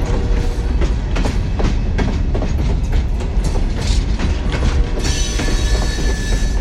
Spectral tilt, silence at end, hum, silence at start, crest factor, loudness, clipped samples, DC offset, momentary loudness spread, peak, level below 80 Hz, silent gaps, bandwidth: -5 dB/octave; 0 s; none; 0 s; 12 dB; -19 LUFS; under 0.1%; under 0.1%; 2 LU; -4 dBFS; -18 dBFS; none; 12 kHz